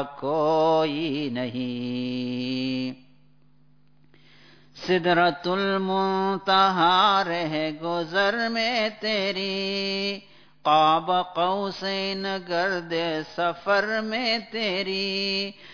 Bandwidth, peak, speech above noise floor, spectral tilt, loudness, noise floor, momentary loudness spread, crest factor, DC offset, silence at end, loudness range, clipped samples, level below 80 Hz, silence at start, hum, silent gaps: 5.4 kHz; -8 dBFS; 37 dB; -5 dB/octave; -24 LUFS; -61 dBFS; 9 LU; 16 dB; 0.2%; 0 s; 8 LU; under 0.1%; -66 dBFS; 0 s; none; none